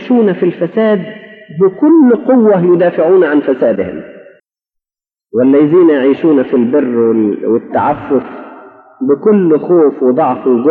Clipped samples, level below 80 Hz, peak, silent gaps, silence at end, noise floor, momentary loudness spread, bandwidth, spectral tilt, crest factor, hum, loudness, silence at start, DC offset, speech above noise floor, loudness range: under 0.1%; -58 dBFS; 0 dBFS; none; 0 s; -90 dBFS; 9 LU; 4.2 kHz; -11 dB/octave; 10 dB; none; -10 LUFS; 0 s; under 0.1%; 80 dB; 3 LU